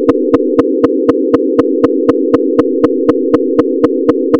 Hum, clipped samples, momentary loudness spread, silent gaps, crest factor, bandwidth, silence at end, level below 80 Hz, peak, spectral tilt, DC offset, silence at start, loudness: none; 2%; 1 LU; none; 10 dB; 6.4 kHz; 0 s; -44 dBFS; 0 dBFS; -8.5 dB/octave; under 0.1%; 0 s; -11 LUFS